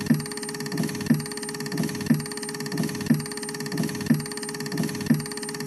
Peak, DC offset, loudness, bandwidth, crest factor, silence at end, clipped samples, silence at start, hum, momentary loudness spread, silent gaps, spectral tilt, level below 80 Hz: -8 dBFS; under 0.1%; -27 LUFS; 13 kHz; 18 dB; 0 s; under 0.1%; 0 s; none; 6 LU; none; -5 dB/octave; -58 dBFS